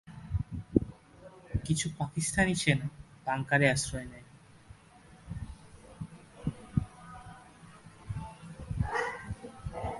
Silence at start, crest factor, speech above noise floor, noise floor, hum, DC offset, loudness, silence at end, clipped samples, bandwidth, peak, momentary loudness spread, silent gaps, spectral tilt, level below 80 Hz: 0.05 s; 28 dB; 26 dB; -56 dBFS; none; under 0.1%; -33 LUFS; 0 s; under 0.1%; 11.5 kHz; -6 dBFS; 25 LU; none; -5 dB/octave; -48 dBFS